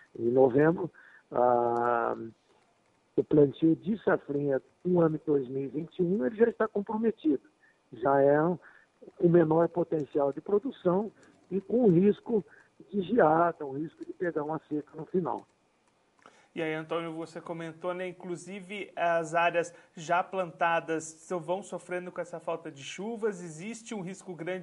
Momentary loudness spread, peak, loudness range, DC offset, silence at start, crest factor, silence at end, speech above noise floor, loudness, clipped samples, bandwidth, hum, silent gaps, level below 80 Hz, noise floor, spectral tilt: 15 LU; -10 dBFS; 9 LU; under 0.1%; 0.2 s; 18 dB; 0 s; 41 dB; -29 LUFS; under 0.1%; 11 kHz; none; none; -70 dBFS; -69 dBFS; -7 dB/octave